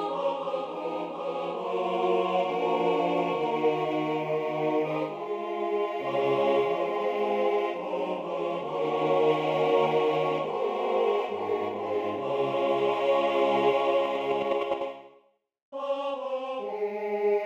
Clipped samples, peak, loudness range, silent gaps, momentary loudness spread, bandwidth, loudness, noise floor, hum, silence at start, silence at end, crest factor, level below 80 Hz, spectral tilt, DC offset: under 0.1%; -12 dBFS; 2 LU; 15.62-15.72 s; 8 LU; 8.6 kHz; -28 LUFS; -63 dBFS; none; 0 s; 0 s; 16 dB; -74 dBFS; -6.5 dB/octave; under 0.1%